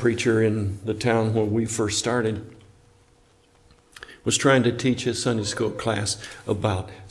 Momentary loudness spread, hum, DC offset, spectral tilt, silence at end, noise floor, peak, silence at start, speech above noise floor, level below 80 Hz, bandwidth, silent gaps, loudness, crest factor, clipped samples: 11 LU; none; under 0.1%; -4.5 dB/octave; 0 s; -58 dBFS; -4 dBFS; 0 s; 35 dB; -56 dBFS; 12 kHz; none; -24 LUFS; 20 dB; under 0.1%